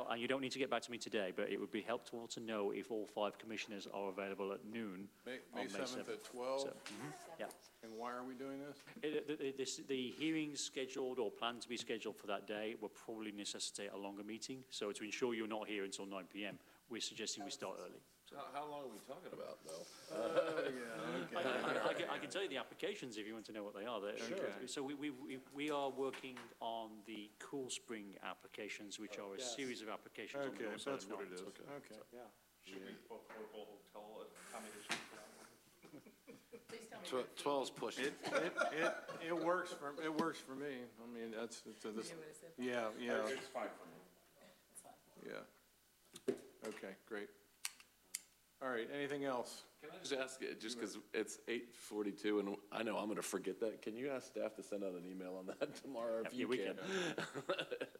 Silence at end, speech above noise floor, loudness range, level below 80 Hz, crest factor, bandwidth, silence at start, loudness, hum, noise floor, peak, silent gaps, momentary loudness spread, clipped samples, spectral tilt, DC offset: 0 s; 28 dB; 8 LU; -88 dBFS; 24 dB; 16 kHz; 0 s; -45 LUFS; none; -73 dBFS; -22 dBFS; none; 14 LU; under 0.1%; -3.5 dB/octave; under 0.1%